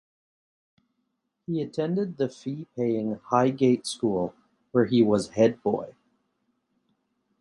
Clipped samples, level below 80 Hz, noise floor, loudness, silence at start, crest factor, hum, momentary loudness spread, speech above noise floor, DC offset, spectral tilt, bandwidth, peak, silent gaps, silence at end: under 0.1%; -64 dBFS; -77 dBFS; -26 LUFS; 1.5 s; 20 dB; none; 12 LU; 53 dB; under 0.1%; -6.5 dB/octave; 11.5 kHz; -8 dBFS; none; 1.5 s